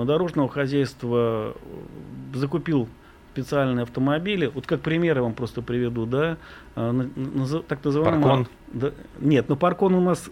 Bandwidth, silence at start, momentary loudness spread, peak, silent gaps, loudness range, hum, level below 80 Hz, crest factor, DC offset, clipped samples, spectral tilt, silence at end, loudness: 15.5 kHz; 0 s; 14 LU; -6 dBFS; none; 4 LU; none; -50 dBFS; 18 dB; under 0.1%; under 0.1%; -7.5 dB/octave; 0 s; -24 LUFS